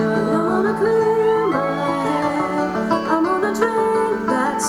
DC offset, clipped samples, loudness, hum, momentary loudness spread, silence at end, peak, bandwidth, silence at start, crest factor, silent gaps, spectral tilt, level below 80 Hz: under 0.1%; under 0.1%; -19 LUFS; none; 4 LU; 0 s; -4 dBFS; 13 kHz; 0 s; 14 dB; none; -5.5 dB/octave; -52 dBFS